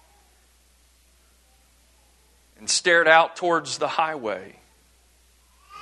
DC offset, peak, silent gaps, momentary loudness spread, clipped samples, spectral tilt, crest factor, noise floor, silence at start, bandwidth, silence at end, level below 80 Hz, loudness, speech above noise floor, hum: under 0.1%; -2 dBFS; none; 16 LU; under 0.1%; -1.5 dB/octave; 24 dB; -59 dBFS; 2.6 s; 12.5 kHz; 0 s; -64 dBFS; -21 LUFS; 38 dB; none